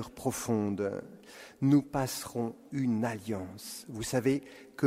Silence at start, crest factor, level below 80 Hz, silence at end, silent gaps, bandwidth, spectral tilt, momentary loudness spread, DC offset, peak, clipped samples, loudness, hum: 0 s; 18 dB; -62 dBFS; 0 s; none; 16 kHz; -6 dB/octave; 15 LU; under 0.1%; -14 dBFS; under 0.1%; -32 LUFS; none